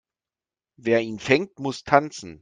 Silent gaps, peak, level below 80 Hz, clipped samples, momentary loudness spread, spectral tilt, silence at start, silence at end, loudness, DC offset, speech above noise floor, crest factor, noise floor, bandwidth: none; -2 dBFS; -60 dBFS; under 0.1%; 11 LU; -5 dB/octave; 0.85 s; 0.05 s; -23 LUFS; under 0.1%; over 67 dB; 22 dB; under -90 dBFS; 9.8 kHz